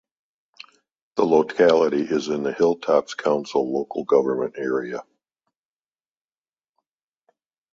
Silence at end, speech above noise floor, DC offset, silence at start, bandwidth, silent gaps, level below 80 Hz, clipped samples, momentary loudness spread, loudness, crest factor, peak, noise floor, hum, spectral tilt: 2.7 s; over 69 dB; under 0.1%; 1.15 s; 7.6 kHz; none; -66 dBFS; under 0.1%; 9 LU; -21 LUFS; 18 dB; -4 dBFS; under -90 dBFS; none; -5.5 dB/octave